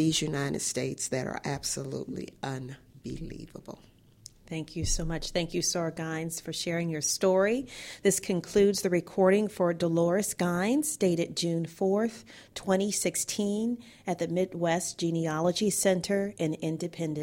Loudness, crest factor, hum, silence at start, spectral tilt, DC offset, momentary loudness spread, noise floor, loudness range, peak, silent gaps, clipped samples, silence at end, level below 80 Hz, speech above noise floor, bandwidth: -29 LUFS; 18 dB; none; 0 s; -4.5 dB/octave; under 0.1%; 14 LU; -54 dBFS; 9 LU; -10 dBFS; none; under 0.1%; 0 s; -48 dBFS; 25 dB; 16.5 kHz